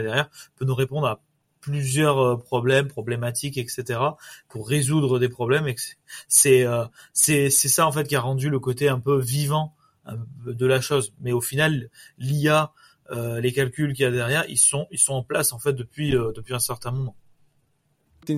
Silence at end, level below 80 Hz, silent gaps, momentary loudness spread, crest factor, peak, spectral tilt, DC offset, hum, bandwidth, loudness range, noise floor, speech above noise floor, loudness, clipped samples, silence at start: 0 s; -56 dBFS; none; 16 LU; 20 dB; -2 dBFS; -4 dB/octave; under 0.1%; none; 16 kHz; 5 LU; -68 dBFS; 45 dB; -22 LUFS; under 0.1%; 0 s